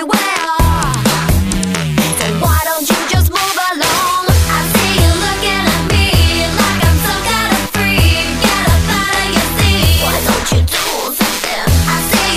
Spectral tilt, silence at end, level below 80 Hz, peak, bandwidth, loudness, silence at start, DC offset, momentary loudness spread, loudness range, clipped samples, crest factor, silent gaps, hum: -4 dB/octave; 0 s; -20 dBFS; 0 dBFS; 15.5 kHz; -12 LUFS; 0 s; under 0.1%; 3 LU; 1 LU; under 0.1%; 12 dB; none; none